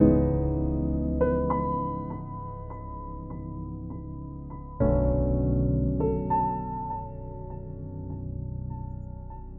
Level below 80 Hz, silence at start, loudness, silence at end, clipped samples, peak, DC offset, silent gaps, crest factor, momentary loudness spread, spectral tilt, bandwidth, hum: -36 dBFS; 0 s; -29 LUFS; 0 s; under 0.1%; -6 dBFS; under 0.1%; none; 22 dB; 14 LU; -14.5 dB/octave; 2.8 kHz; none